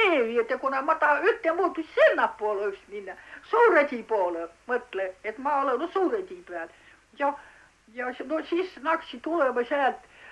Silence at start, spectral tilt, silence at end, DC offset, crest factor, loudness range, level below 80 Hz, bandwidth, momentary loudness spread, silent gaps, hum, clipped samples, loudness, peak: 0 s; -4 dB/octave; 0 s; under 0.1%; 18 dB; 7 LU; -68 dBFS; 11 kHz; 17 LU; none; none; under 0.1%; -26 LUFS; -8 dBFS